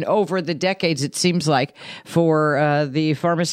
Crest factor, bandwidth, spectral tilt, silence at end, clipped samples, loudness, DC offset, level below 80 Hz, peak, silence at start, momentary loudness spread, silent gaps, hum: 14 dB; 15 kHz; -5 dB/octave; 0 s; under 0.1%; -20 LUFS; under 0.1%; -64 dBFS; -6 dBFS; 0 s; 5 LU; none; none